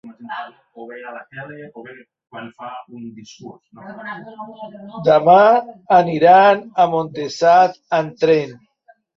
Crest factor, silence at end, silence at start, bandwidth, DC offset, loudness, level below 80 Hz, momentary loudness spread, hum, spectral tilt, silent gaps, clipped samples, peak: 16 dB; 0.65 s; 0.05 s; 7.2 kHz; under 0.1%; -14 LUFS; -64 dBFS; 25 LU; none; -6 dB/octave; none; under 0.1%; -2 dBFS